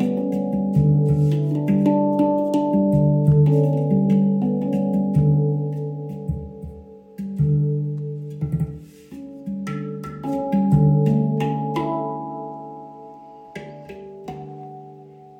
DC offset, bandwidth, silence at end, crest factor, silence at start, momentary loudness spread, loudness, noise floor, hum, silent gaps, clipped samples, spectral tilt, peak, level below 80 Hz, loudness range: under 0.1%; 3.8 kHz; 0.05 s; 16 dB; 0 s; 21 LU; -21 LUFS; -43 dBFS; none; none; under 0.1%; -10.5 dB/octave; -6 dBFS; -44 dBFS; 8 LU